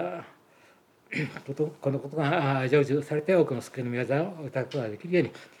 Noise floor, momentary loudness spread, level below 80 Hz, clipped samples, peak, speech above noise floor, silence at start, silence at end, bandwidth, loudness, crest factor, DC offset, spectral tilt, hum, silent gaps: -60 dBFS; 10 LU; -78 dBFS; under 0.1%; -10 dBFS; 32 dB; 0 s; 0.15 s; 13 kHz; -28 LUFS; 18 dB; under 0.1%; -7.5 dB/octave; none; none